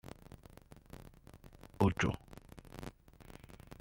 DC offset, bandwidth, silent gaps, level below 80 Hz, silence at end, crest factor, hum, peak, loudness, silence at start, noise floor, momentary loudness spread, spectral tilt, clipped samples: under 0.1%; 16.5 kHz; none; -56 dBFS; 0.05 s; 24 dB; none; -16 dBFS; -36 LUFS; 0.05 s; -58 dBFS; 25 LU; -6.5 dB/octave; under 0.1%